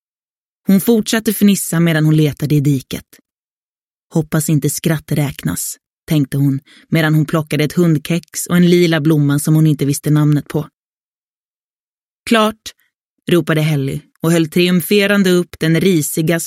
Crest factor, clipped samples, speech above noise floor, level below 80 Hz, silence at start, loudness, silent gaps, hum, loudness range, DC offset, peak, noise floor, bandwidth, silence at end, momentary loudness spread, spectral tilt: 14 dB; under 0.1%; over 76 dB; -50 dBFS; 0.7 s; -15 LUFS; 3.39-4.08 s, 5.86-6.07 s, 10.73-11.97 s, 12.05-12.24 s, 12.95-13.17 s; none; 5 LU; under 0.1%; 0 dBFS; under -90 dBFS; 16.5 kHz; 0 s; 10 LU; -5.5 dB/octave